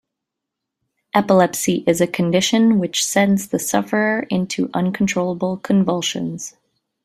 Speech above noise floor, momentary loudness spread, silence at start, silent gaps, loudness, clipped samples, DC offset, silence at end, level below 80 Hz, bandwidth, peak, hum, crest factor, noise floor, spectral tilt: 64 dB; 7 LU; 1.15 s; none; -18 LUFS; under 0.1%; under 0.1%; 0.55 s; -58 dBFS; 15.5 kHz; -2 dBFS; none; 18 dB; -82 dBFS; -4.5 dB/octave